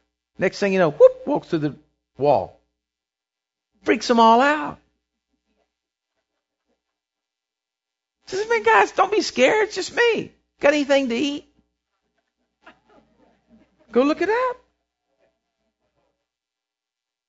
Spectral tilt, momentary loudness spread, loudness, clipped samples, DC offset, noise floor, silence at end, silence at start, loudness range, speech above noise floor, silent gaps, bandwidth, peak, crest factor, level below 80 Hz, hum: -4.5 dB/octave; 14 LU; -19 LUFS; under 0.1%; under 0.1%; -87 dBFS; 2.75 s; 0.4 s; 8 LU; 69 dB; none; 8 kHz; -2 dBFS; 22 dB; -62 dBFS; none